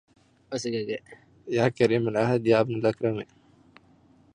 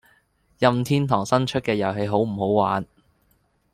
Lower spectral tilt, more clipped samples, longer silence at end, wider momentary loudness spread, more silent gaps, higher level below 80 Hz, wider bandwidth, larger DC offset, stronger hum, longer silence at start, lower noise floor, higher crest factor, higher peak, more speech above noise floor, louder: about the same, -6.5 dB/octave vs -6.5 dB/octave; neither; first, 1.1 s vs 0.9 s; first, 14 LU vs 3 LU; neither; second, -64 dBFS vs -56 dBFS; second, 10.5 kHz vs 15 kHz; neither; neither; about the same, 0.5 s vs 0.6 s; second, -59 dBFS vs -65 dBFS; about the same, 20 dB vs 20 dB; second, -6 dBFS vs -2 dBFS; second, 34 dB vs 44 dB; second, -26 LUFS vs -22 LUFS